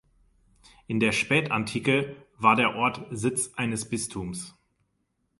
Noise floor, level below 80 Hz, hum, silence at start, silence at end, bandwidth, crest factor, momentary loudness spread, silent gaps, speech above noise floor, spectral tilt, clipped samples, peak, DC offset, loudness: -75 dBFS; -58 dBFS; none; 0.9 s; 0.9 s; 11.5 kHz; 22 dB; 13 LU; none; 48 dB; -4 dB/octave; under 0.1%; -6 dBFS; under 0.1%; -26 LUFS